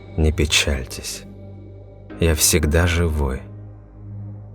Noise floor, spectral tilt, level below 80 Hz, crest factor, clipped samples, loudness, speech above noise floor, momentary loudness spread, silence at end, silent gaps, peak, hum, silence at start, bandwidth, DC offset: -39 dBFS; -3.5 dB/octave; -30 dBFS; 20 dB; under 0.1%; -19 LUFS; 21 dB; 24 LU; 0 s; none; 0 dBFS; 50 Hz at -45 dBFS; 0 s; 19.5 kHz; under 0.1%